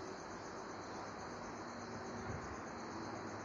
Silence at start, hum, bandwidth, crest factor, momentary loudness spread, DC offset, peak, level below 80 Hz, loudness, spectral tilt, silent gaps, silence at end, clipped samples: 0 s; none; 11 kHz; 14 dB; 2 LU; under 0.1%; -34 dBFS; -66 dBFS; -47 LUFS; -4.5 dB/octave; none; 0 s; under 0.1%